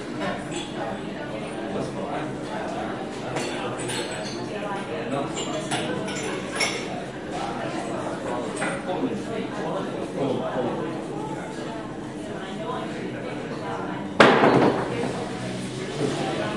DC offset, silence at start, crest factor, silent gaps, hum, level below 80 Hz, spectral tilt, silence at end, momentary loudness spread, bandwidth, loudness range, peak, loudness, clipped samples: 0.2%; 0 s; 26 dB; none; none; -56 dBFS; -4.5 dB/octave; 0 s; 7 LU; 11.5 kHz; 8 LU; 0 dBFS; -27 LUFS; under 0.1%